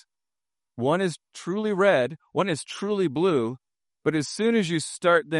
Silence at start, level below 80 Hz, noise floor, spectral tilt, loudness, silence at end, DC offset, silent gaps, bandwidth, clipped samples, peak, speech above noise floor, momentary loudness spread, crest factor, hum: 0.75 s; -70 dBFS; under -90 dBFS; -5 dB/octave; -25 LUFS; 0 s; under 0.1%; none; 11.5 kHz; under 0.1%; -8 dBFS; over 66 dB; 9 LU; 16 dB; none